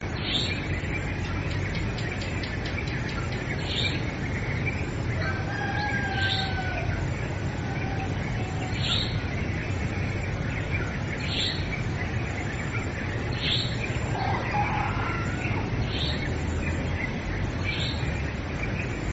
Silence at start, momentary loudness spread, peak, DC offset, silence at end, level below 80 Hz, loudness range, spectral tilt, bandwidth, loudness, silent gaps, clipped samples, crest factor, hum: 0 s; 4 LU; -12 dBFS; 0.1%; 0 s; -38 dBFS; 2 LU; -5.5 dB/octave; 8 kHz; -28 LUFS; none; under 0.1%; 16 dB; none